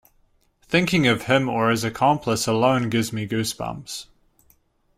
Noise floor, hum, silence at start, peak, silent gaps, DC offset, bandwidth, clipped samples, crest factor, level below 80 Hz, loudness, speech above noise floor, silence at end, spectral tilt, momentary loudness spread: -62 dBFS; none; 0.7 s; -6 dBFS; none; under 0.1%; 16 kHz; under 0.1%; 18 dB; -54 dBFS; -21 LUFS; 41 dB; 0.95 s; -5 dB/octave; 12 LU